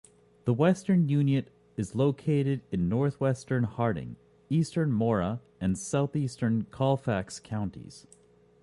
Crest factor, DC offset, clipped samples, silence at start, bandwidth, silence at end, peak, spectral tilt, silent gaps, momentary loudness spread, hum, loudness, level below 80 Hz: 16 dB; under 0.1%; under 0.1%; 0.45 s; 11.5 kHz; 0.65 s; -12 dBFS; -7.5 dB/octave; none; 10 LU; none; -29 LUFS; -54 dBFS